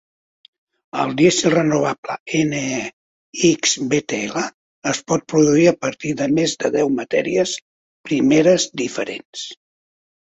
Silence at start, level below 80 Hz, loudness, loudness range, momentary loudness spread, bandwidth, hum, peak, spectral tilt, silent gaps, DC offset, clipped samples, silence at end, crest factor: 0.95 s; -58 dBFS; -18 LUFS; 2 LU; 14 LU; 8.2 kHz; none; -2 dBFS; -4 dB/octave; 1.98-2.03 s, 2.20-2.26 s, 2.93-3.33 s, 4.54-4.82 s, 7.62-8.04 s, 9.25-9.33 s; under 0.1%; under 0.1%; 0.8 s; 18 dB